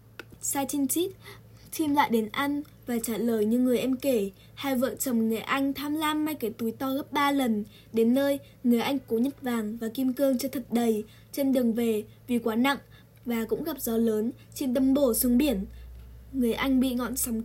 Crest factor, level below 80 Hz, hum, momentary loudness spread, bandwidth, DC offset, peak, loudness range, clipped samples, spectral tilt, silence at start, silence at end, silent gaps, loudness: 16 dB; -52 dBFS; none; 9 LU; 16.5 kHz; under 0.1%; -12 dBFS; 2 LU; under 0.1%; -4 dB/octave; 0.4 s; 0 s; none; -27 LUFS